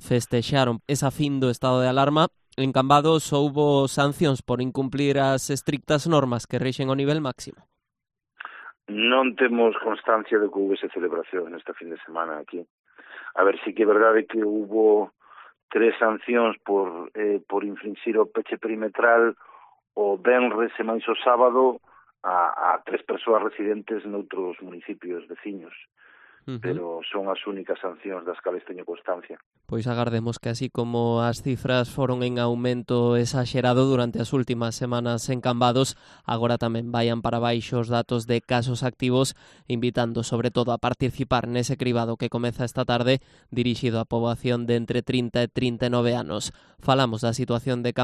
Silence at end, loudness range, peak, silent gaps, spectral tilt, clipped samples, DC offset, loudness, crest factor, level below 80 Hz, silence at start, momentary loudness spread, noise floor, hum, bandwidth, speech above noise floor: 0 s; 8 LU; -4 dBFS; 12.70-12.84 s, 15.63-15.69 s, 29.46-29.51 s; -6 dB/octave; under 0.1%; under 0.1%; -24 LUFS; 20 dB; -56 dBFS; 0 s; 13 LU; -43 dBFS; none; 13 kHz; 19 dB